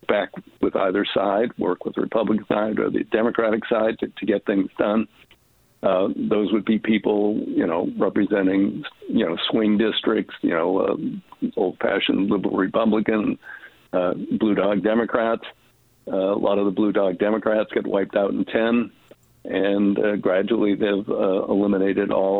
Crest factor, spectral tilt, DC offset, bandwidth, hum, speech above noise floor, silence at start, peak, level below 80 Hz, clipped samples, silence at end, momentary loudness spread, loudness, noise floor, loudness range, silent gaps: 18 dB; -8.5 dB/octave; under 0.1%; 4.3 kHz; none; 37 dB; 0.1 s; -2 dBFS; -58 dBFS; under 0.1%; 0 s; 6 LU; -22 LUFS; -58 dBFS; 1 LU; none